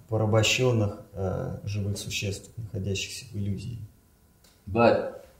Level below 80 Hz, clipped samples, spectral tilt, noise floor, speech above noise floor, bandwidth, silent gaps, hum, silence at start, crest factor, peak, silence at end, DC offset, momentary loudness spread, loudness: -54 dBFS; under 0.1%; -5 dB/octave; -60 dBFS; 33 dB; 16 kHz; none; none; 0.1 s; 22 dB; -6 dBFS; 0.15 s; under 0.1%; 15 LU; -27 LUFS